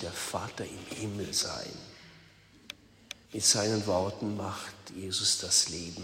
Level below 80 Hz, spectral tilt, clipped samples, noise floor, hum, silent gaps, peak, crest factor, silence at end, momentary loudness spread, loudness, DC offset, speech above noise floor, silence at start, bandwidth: -64 dBFS; -2.5 dB/octave; under 0.1%; -58 dBFS; none; none; -10 dBFS; 24 dB; 0 s; 22 LU; -30 LUFS; under 0.1%; 26 dB; 0 s; 16 kHz